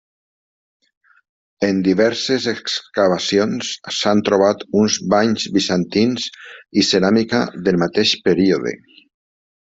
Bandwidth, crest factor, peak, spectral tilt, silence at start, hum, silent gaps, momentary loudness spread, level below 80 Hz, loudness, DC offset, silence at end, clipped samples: 8 kHz; 16 dB; -2 dBFS; -4.5 dB/octave; 1.6 s; none; none; 7 LU; -56 dBFS; -17 LUFS; under 0.1%; 0.9 s; under 0.1%